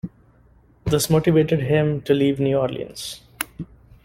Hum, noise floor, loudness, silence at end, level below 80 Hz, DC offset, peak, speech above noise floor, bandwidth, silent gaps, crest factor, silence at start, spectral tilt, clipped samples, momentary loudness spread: none; -54 dBFS; -21 LUFS; 0.4 s; -46 dBFS; under 0.1%; -2 dBFS; 35 dB; 16.5 kHz; none; 20 dB; 0.05 s; -6 dB/octave; under 0.1%; 15 LU